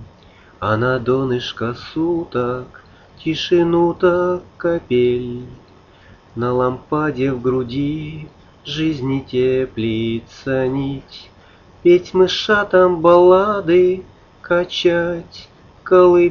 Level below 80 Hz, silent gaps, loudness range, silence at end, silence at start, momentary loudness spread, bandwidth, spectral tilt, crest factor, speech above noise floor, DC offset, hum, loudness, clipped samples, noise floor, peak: -46 dBFS; none; 7 LU; 0 s; 0 s; 15 LU; 6.8 kHz; -7 dB/octave; 18 dB; 30 dB; under 0.1%; none; -17 LUFS; under 0.1%; -46 dBFS; 0 dBFS